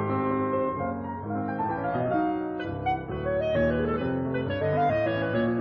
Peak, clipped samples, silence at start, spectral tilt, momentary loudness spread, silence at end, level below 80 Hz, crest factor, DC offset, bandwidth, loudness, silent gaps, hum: -14 dBFS; under 0.1%; 0 s; -6 dB/octave; 6 LU; 0 s; -48 dBFS; 14 dB; under 0.1%; 6 kHz; -28 LUFS; none; none